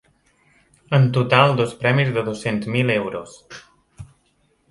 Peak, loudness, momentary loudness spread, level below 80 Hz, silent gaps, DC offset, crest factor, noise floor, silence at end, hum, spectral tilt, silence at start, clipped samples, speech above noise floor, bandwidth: 0 dBFS; -19 LUFS; 23 LU; -56 dBFS; none; under 0.1%; 20 dB; -63 dBFS; 0.65 s; none; -6.5 dB/octave; 0.9 s; under 0.1%; 44 dB; 11.5 kHz